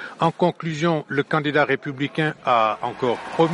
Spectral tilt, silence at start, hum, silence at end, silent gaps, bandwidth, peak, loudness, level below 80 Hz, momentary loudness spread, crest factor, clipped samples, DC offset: -6.5 dB/octave; 0 s; none; 0 s; none; 11 kHz; -6 dBFS; -22 LUFS; -62 dBFS; 5 LU; 16 dB; under 0.1%; under 0.1%